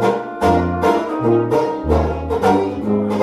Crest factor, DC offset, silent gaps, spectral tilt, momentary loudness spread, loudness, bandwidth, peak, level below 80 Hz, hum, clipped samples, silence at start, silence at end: 14 dB; under 0.1%; none; -7.5 dB/octave; 3 LU; -17 LUFS; 15 kHz; -2 dBFS; -32 dBFS; none; under 0.1%; 0 s; 0 s